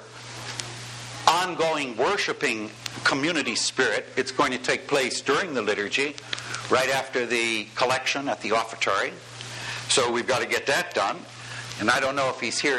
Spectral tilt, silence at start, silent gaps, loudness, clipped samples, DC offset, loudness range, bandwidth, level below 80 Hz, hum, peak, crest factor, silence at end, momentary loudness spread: -2.5 dB/octave; 0 s; none; -25 LUFS; under 0.1%; under 0.1%; 1 LU; 13 kHz; -64 dBFS; none; -2 dBFS; 24 dB; 0 s; 12 LU